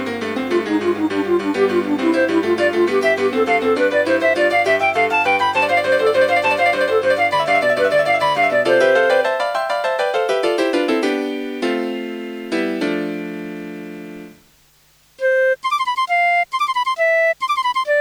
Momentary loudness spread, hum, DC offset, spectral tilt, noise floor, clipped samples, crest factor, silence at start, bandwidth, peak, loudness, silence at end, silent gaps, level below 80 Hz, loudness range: 9 LU; none; under 0.1%; -4.5 dB/octave; -54 dBFS; under 0.1%; 14 dB; 0 s; over 20 kHz; -2 dBFS; -17 LUFS; 0 s; none; -64 dBFS; 8 LU